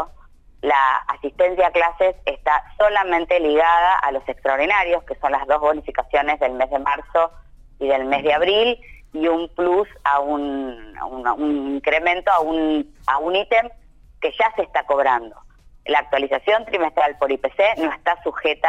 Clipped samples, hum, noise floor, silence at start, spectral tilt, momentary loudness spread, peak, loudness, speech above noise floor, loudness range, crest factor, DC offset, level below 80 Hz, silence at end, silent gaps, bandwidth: under 0.1%; none; -47 dBFS; 0 s; -4.5 dB/octave; 8 LU; -6 dBFS; -19 LUFS; 27 dB; 3 LU; 14 dB; under 0.1%; -46 dBFS; 0 s; none; 9 kHz